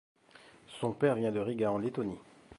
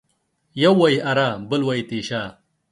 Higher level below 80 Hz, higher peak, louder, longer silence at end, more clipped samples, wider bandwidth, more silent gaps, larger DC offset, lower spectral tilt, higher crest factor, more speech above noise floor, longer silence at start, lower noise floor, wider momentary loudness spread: second, -68 dBFS vs -60 dBFS; second, -14 dBFS vs -2 dBFS; second, -33 LUFS vs -20 LUFS; second, 0.05 s vs 0.4 s; neither; about the same, 11.5 kHz vs 11.5 kHz; neither; neither; first, -7.5 dB/octave vs -6 dB/octave; about the same, 20 dB vs 18 dB; second, 27 dB vs 49 dB; first, 0.7 s vs 0.55 s; second, -59 dBFS vs -69 dBFS; about the same, 13 LU vs 13 LU